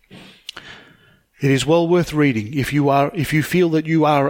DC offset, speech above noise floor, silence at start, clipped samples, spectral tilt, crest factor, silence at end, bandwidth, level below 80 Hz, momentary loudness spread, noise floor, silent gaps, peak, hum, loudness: under 0.1%; 36 dB; 0.15 s; under 0.1%; -6.5 dB/octave; 16 dB; 0 s; 17 kHz; -48 dBFS; 19 LU; -53 dBFS; none; -2 dBFS; none; -18 LUFS